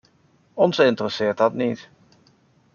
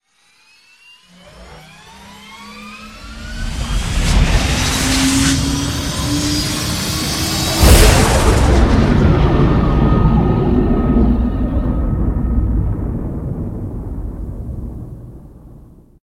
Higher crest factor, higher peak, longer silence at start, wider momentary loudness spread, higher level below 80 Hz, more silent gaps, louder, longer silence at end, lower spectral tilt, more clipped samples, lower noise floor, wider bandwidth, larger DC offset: about the same, 20 dB vs 16 dB; second, -4 dBFS vs 0 dBFS; second, 0.55 s vs 1.35 s; second, 13 LU vs 19 LU; second, -68 dBFS vs -20 dBFS; neither; second, -21 LUFS vs -15 LUFS; first, 0.95 s vs 0.45 s; about the same, -6 dB/octave vs -5 dB/octave; neither; first, -60 dBFS vs -54 dBFS; second, 7.2 kHz vs 16.5 kHz; neither